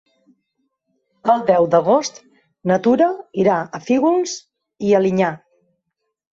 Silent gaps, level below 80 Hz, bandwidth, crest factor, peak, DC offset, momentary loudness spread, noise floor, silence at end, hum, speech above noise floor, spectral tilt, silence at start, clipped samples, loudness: none; -62 dBFS; 8 kHz; 16 dB; -2 dBFS; under 0.1%; 11 LU; -76 dBFS; 0.95 s; none; 59 dB; -6 dB/octave; 1.25 s; under 0.1%; -18 LUFS